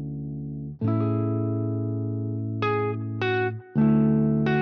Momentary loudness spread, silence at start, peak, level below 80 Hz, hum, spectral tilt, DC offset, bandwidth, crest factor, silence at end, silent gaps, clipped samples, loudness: 12 LU; 0 s; -12 dBFS; -54 dBFS; none; -7.5 dB/octave; under 0.1%; 5.8 kHz; 12 dB; 0 s; none; under 0.1%; -26 LUFS